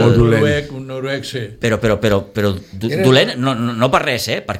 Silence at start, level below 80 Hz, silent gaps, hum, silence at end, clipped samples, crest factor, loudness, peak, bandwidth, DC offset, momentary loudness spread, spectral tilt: 0 s; -36 dBFS; none; none; 0 s; under 0.1%; 16 dB; -16 LUFS; 0 dBFS; 16 kHz; under 0.1%; 11 LU; -6 dB/octave